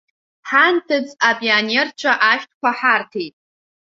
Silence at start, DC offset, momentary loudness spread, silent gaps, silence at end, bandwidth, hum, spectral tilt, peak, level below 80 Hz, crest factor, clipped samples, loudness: 0.45 s; under 0.1%; 13 LU; 2.54-2.61 s; 0.65 s; 7.8 kHz; none; -2.5 dB/octave; 0 dBFS; -70 dBFS; 18 dB; under 0.1%; -16 LUFS